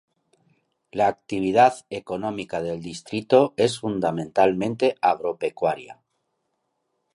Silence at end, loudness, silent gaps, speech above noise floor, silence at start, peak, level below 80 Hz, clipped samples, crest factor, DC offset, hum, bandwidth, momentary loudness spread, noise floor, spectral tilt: 1.2 s; -23 LUFS; none; 53 dB; 0.95 s; -4 dBFS; -60 dBFS; under 0.1%; 20 dB; under 0.1%; none; 11.5 kHz; 13 LU; -75 dBFS; -5.5 dB/octave